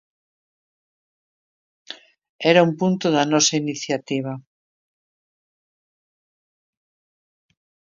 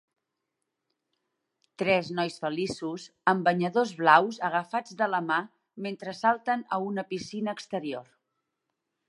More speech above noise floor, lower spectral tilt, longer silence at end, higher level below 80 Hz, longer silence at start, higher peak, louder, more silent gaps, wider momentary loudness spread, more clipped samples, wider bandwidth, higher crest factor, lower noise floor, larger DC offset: first, over 71 dB vs 56 dB; second, -4 dB/octave vs -5.5 dB/octave; first, 3.5 s vs 1.05 s; about the same, -72 dBFS vs -74 dBFS; about the same, 1.9 s vs 1.8 s; first, 0 dBFS vs -4 dBFS; first, -19 LUFS vs -28 LUFS; first, 2.29-2.39 s vs none; first, 23 LU vs 14 LU; neither; second, 7.6 kHz vs 11.5 kHz; about the same, 24 dB vs 26 dB; first, under -90 dBFS vs -83 dBFS; neither